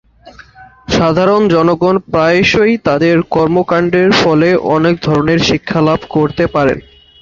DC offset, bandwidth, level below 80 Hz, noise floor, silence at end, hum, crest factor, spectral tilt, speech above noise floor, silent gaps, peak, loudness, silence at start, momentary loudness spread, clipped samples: under 0.1%; 7.6 kHz; -38 dBFS; -39 dBFS; 0.4 s; none; 12 dB; -6 dB/octave; 28 dB; none; 0 dBFS; -11 LUFS; 0.25 s; 4 LU; under 0.1%